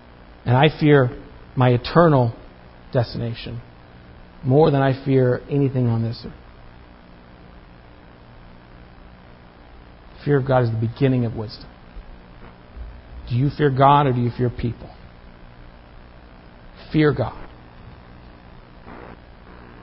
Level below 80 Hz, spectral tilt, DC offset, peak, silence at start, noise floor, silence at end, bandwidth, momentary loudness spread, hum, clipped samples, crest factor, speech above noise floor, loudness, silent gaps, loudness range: -44 dBFS; -12 dB/octave; under 0.1%; 0 dBFS; 0.45 s; -45 dBFS; 0.1 s; 5.8 kHz; 25 LU; 60 Hz at -50 dBFS; under 0.1%; 22 dB; 27 dB; -19 LUFS; none; 7 LU